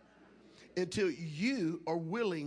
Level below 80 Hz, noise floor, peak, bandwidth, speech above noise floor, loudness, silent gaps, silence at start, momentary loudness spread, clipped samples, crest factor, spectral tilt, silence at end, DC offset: -70 dBFS; -61 dBFS; -22 dBFS; 10.5 kHz; 26 dB; -36 LUFS; none; 0.2 s; 4 LU; under 0.1%; 16 dB; -5.5 dB/octave; 0 s; under 0.1%